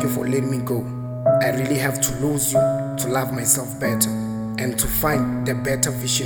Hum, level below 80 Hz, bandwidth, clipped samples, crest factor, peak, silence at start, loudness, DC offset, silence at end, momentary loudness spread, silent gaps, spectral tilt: none; -42 dBFS; over 20 kHz; under 0.1%; 18 dB; -2 dBFS; 0 s; -21 LUFS; under 0.1%; 0 s; 6 LU; none; -4.5 dB/octave